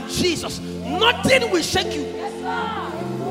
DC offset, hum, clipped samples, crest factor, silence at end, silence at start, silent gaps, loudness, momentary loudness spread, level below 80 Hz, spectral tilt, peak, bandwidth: under 0.1%; none; under 0.1%; 20 dB; 0 s; 0 s; none; -21 LUFS; 11 LU; -46 dBFS; -3.5 dB/octave; -2 dBFS; 16.5 kHz